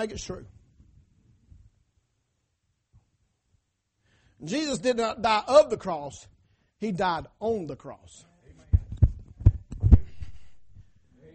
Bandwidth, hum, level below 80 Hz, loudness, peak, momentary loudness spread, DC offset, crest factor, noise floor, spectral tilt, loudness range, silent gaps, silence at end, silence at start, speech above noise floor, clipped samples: 8.4 kHz; none; -34 dBFS; -26 LUFS; -6 dBFS; 24 LU; under 0.1%; 22 dB; -76 dBFS; -6.5 dB/octave; 8 LU; none; 0.55 s; 0 s; 49 dB; under 0.1%